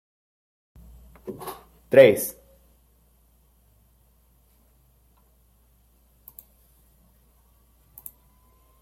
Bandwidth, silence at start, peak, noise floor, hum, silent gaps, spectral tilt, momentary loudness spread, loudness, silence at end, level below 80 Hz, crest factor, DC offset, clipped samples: 16.5 kHz; 1.25 s; -2 dBFS; -61 dBFS; none; none; -4.5 dB/octave; 31 LU; -19 LUFS; 6.5 s; -58 dBFS; 26 dB; under 0.1%; under 0.1%